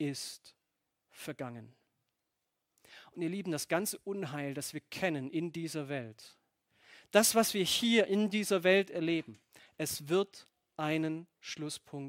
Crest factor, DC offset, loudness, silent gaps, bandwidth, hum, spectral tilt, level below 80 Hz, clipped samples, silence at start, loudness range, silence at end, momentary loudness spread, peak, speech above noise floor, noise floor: 26 dB; under 0.1%; -33 LUFS; none; 16.5 kHz; none; -3.5 dB/octave; -76 dBFS; under 0.1%; 0 s; 10 LU; 0 s; 17 LU; -10 dBFS; 52 dB; -85 dBFS